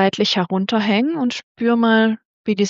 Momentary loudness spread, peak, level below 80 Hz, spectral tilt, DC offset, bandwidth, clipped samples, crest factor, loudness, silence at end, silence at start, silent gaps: 8 LU; -4 dBFS; -66 dBFS; -5 dB/octave; under 0.1%; 7.6 kHz; under 0.1%; 12 dB; -18 LUFS; 0 s; 0 s; 1.43-1.55 s, 2.25-2.45 s